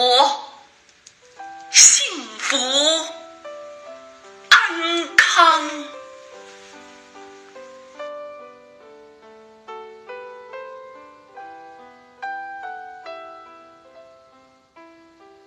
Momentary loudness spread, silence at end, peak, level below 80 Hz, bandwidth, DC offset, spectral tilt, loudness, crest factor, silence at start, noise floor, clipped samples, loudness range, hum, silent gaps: 27 LU; 2.05 s; 0 dBFS; -72 dBFS; 13 kHz; under 0.1%; 2 dB/octave; -15 LUFS; 22 dB; 0 s; -53 dBFS; under 0.1%; 23 LU; none; none